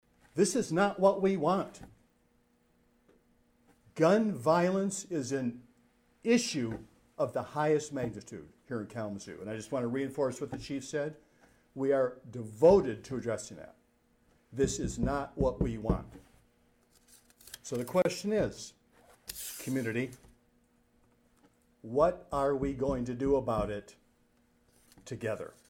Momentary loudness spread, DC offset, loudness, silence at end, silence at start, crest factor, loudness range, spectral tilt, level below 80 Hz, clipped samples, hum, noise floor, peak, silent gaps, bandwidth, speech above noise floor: 18 LU; under 0.1%; -32 LUFS; 0.2 s; 0.35 s; 20 dB; 5 LU; -5.5 dB/octave; -52 dBFS; under 0.1%; none; -70 dBFS; -12 dBFS; none; 18 kHz; 39 dB